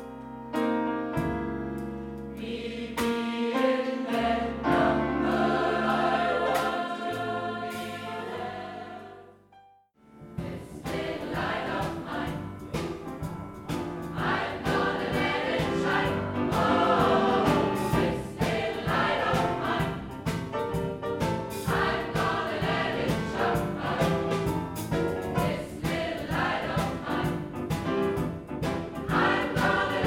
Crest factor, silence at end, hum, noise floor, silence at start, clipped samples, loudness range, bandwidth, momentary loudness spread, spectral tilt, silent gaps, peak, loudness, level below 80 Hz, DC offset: 18 dB; 0 s; none; -58 dBFS; 0 s; under 0.1%; 9 LU; 18 kHz; 11 LU; -6 dB/octave; none; -10 dBFS; -28 LUFS; -48 dBFS; under 0.1%